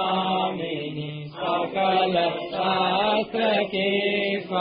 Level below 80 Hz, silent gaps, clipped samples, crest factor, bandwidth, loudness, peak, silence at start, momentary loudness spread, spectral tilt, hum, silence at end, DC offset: -62 dBFS; none; under 0.1%; 14 dB; 5.2 kHz; -24 LUFS; -10 dBFS; 0 s; 9 LU; -9.5 dB/octave; none; 0 s; under 0.1%